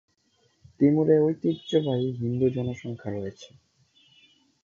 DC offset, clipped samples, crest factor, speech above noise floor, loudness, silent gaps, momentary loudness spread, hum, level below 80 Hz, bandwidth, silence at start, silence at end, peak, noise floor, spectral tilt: under 0.1%; under 0.1%; 18 dB; 43 dB; -25 LUFS; none; 13 LU; none; -60 dBFS; 7.2 kHz; 0.8 s; 1.2 s; -8 dBFS; -68 dBFS; -8.5 dB/octave